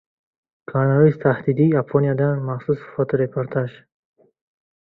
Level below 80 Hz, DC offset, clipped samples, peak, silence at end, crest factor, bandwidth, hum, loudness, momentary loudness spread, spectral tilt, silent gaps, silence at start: -58 dBFS; under 0.1%; under 0.1%; -2 dBFS; 1.15 s; 18 dB; 4.1 kHz; none; -20 LUFS; 9 LU; -12 dB/octave; none; 0.7 s